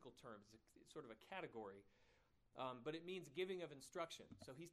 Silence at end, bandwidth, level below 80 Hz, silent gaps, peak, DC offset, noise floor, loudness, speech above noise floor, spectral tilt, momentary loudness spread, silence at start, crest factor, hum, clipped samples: 0 s; 13 kHz; -84 dBFS; none; -34 dBFS; under 0.1%; -78 dBFS; -53 LUFS; 24 dB; -4.5 dB/octave; 12 LU; 0 s; 20 dB; none; under 0.1%